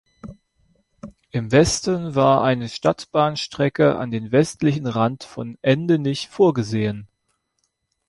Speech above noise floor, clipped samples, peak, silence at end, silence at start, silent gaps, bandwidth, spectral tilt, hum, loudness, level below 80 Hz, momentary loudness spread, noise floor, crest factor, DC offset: 53 dB; under 0.1%; -4 dBFS; 1.05 s; 0.25 s; none; 11.5 kHz; -5.5 dB/octave; none; -20 LUFS; -50 dBFS; 9 LU; -72 dBFS; 18 dB; under 0.1%